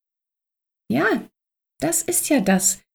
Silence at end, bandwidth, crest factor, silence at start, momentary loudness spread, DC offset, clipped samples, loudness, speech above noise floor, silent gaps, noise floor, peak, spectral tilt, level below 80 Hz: 0.15 s; over 20 kHz; 18 dB; 0.9 s; 9 LU; under 0.1%; under 0.1%; -20 LUFS; 67 dB; none; -87 dBFS; -6 dBFS; -3.5 dB/octave; -58 dBFS